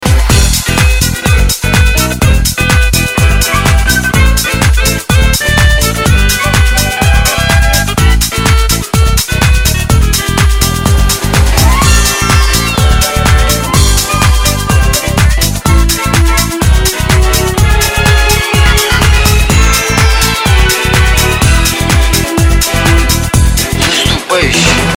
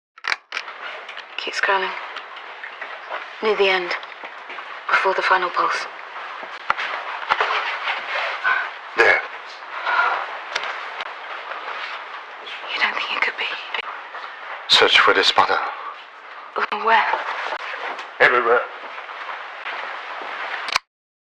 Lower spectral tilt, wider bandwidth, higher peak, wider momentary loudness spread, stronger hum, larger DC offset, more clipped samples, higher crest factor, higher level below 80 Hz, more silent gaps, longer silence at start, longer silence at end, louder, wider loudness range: first, -3.5 dB/octave vs -1.5 dB/octave; first, 18.5 kHz vs 13 kHz; about the same, 0 dBFS vs 0 dBFS; second, 2 LU vs 17 LU; neither; neither; first, 0.6% vs under 0.1%; second, 8 dB vs 22 dB; first, -12 dBFS vs -66 dBFS; neither; second, 0 s vs 0.25 s; second, 0 s vs 0.5 s; first, -9 LUFS vs -21 LUFS; second, 1 LU vs 7 LU